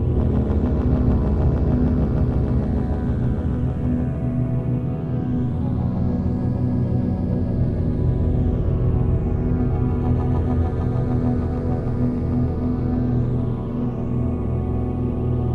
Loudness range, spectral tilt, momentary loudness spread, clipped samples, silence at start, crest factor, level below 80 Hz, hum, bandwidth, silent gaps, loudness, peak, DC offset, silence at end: 2 LU; -11.5 dB/octave; 4 LU; under 0.1%; 0 s; 14 dB; -26 dBFS; none; 4.5 kHz; none; -22 LUFS; -6 dBFS; 0.9%; 0 s